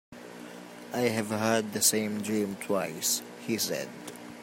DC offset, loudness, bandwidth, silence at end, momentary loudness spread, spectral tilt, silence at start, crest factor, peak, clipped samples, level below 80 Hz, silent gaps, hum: under 0.1%; -29 LUFS; 16.5 kHz; 0 s; 20 LU; -3 dB/octave; 0.1 s; 24 dB; -8 dBFS; under 0.1%; -74 dBFS; none; none